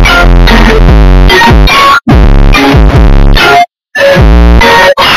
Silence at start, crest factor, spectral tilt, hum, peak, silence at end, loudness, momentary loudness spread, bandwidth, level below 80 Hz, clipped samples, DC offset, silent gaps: 0 s; 2 dB; -5.5 dB/octave; none; 0 dBFS; 0 s; -4 LUFS; 3 LU; 14.5 kHz; -4 dBFS; 4%; under 0.1%; none